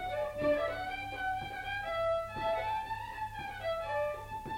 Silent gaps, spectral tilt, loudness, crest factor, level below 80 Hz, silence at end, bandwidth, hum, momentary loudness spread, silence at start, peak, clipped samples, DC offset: none; -5 dB/octave; -36 LUFS; 16 dB; -54 dBFS; 0 s; 16.5 kHz; 50 Hz at -60 dBFS; 8 LU; 0 s; -20 dBFS; under 0.1%; under 0.1%